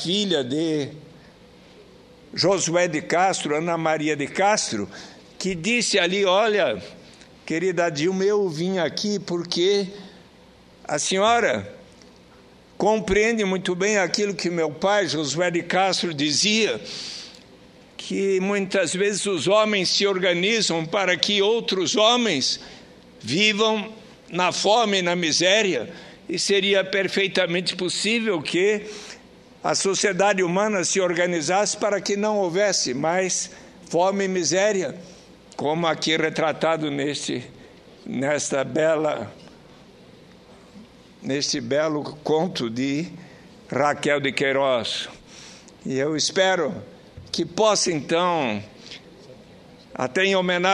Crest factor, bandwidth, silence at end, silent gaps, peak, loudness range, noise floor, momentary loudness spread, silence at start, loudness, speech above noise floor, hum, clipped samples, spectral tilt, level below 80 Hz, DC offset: 22 dB; 11.5 kHz; 0 s; none; 0 dBFS; 5 LU; -50 dBFS; 14 LU; 0 s; -22 LUFS; 28 dB; none; under 0.1%; -3 dB/octave; -58 dBFS; under 0.1%